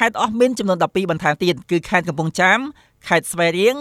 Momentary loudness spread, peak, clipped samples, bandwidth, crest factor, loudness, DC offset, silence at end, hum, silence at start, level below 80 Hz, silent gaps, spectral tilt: 6 LU; -2 dBFS; under 0.1%; 15.5 kHz; 18 dB; -18 LUFS; under 0.1%; 0 s; none; 0 s; -54 dBFS; none; -4.5 dB/octave